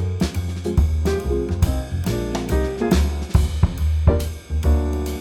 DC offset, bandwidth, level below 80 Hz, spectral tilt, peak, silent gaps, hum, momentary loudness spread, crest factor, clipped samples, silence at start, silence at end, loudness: under 0.1%; 16 kHz; -22 dBFS; -7 dB/octave; -4 dBFS; none; none; 5 LU; 16 dB; under 0.1%; 0 s; 0 s; -21 LUFS